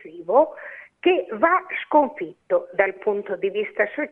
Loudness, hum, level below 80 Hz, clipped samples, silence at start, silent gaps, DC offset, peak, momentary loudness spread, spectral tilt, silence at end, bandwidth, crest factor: -22 LUFS; none; -68 dBFS; under 0.1%; 0.05 s; none; under 0.1%; -2 dBFS; 7 LU; -7.5 dB/octave; 0.05 s; 3.9 kHz; 20 dB